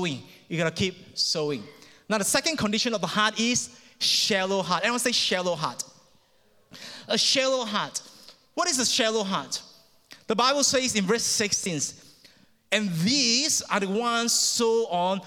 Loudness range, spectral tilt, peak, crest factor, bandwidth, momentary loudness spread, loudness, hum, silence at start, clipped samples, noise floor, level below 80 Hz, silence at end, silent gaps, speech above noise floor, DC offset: 3 LU; -2 dB/octave; -6 dBFS; 20 dB; 19 kHz; 12 LU; -24 LUFS; none; 0 s; under 0.1%; -62 dBFS; -64 dBFS; 0 s; none; 36 dB; under 0.1%